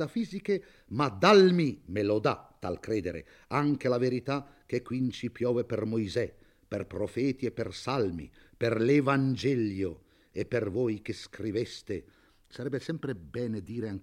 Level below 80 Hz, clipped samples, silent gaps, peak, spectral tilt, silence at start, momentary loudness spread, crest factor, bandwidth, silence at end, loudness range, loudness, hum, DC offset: -62 dBFS; under 0.1%; none; -8 dBFS; -6.5 dB/octave; 0 s; 14 LU; 20 dB; 12 kHz; 0 s; 8 LU; -30 LUFS; none; under 0.1%